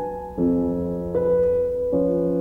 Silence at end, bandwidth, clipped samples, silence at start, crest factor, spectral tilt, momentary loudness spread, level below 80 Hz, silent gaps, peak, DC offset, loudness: 0 s; 2.6 kHz; under 0.1%; 0 s; 10 dB; -11 dB/octave; 5 LU; -42 dBFS; none; -12 dBFS; under 0.1%; -22 LUFS